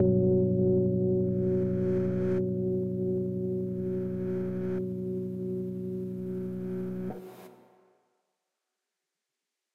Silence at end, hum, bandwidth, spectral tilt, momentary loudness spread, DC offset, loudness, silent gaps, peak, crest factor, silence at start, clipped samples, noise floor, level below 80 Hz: 2.15 s; none; 3.3 kHz; -11.5 dB/octave; 10 LU; under 0.1%; -30 LUFS; none; -14 dBFS; 16 dB; 0 s; under 0.1%; -87 dBFS; -58 dBFS